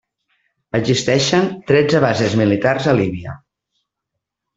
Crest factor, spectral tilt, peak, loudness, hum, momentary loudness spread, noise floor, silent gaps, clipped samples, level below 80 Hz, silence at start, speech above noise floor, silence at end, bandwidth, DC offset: 18 dB; -5.5 dB/octave; 0 dBFS; -16 LUFS; none; 8 LU; -80 dBFS; none; under 0.1%; -52 dBFS; 0.75 s; 64 dB; 1.2 s; 8 kHz; under 0.1%